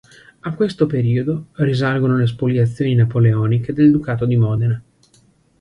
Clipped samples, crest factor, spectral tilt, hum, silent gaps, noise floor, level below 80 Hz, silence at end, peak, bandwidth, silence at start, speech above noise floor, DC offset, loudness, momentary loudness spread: under 0.1%; 14 dB; -9 dB/octave; none; none; -55 dBFS; -48 dBFS; 0.8 s; -2 dBFS; 9.8 kHz; 0.45 s; 39 dB; under 0.1%; -17 LUFS; 7 LU